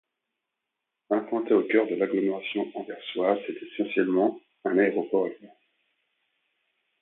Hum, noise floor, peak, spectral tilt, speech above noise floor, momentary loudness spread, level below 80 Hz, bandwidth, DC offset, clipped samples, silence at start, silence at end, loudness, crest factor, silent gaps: none; -84 dBFS; -8 dBFS; -9.5 dB/octave; 58 dB; 10 LU; -80 dBFS; 4.1 kHz; under 0.1%; under 0.1%; 1.1 s; 1.55 s; -27 LUFS; 20 dB; none